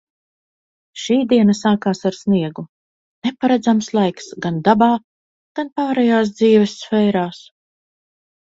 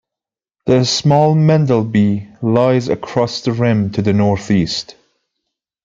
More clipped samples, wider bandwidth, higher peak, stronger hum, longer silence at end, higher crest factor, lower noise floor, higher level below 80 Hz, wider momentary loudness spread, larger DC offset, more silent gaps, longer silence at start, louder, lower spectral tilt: neither; about the same, 7.8 kHz vs 7.6 kHz; about the same, 0 dBFS vs -2 dBFS; neither; first, 1.2 s vs 0.95 s; about the same, 18 dB vs 14 dB; about the same, under -90 dBFS vs -87 dBFS; second, -60 dBFS vs -50 dBFS; first, 13 LU vs 8 LU; neither; first, 2.69-3.22 s, 5.04-5.55 s vs none; first, 0.95 s vs 0.65 s; about the same, -17 LUFS vs -15 LUFS; about the same, -6 dB/octave vs -6.5 dB/octave